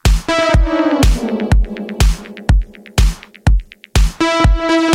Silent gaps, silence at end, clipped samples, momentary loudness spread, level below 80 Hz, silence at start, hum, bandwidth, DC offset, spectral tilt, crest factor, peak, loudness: none; 0 s; under 0.1%; 6 LU; -16 dBFS; 0.05 s; none; 15.5 kHz; under 0.1%; -5.5 dB/octave; 14 dB; 0 dBFS; -16 LUFS